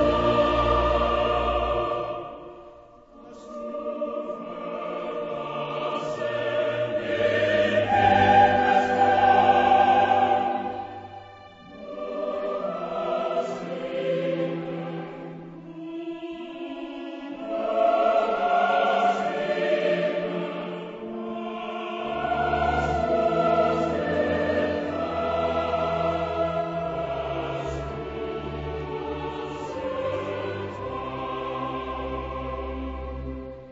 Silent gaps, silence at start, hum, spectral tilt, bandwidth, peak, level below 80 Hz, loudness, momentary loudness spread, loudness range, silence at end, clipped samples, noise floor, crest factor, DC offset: none; 0 s; none; -6.5 dB/octave; 8 kHz; -6 dBFS; -44 dBFS; -25 LUFS; 16 LU; 12 LU; 0 s; under 0.1%; -49 dBFS; 18 dB; under 0.1%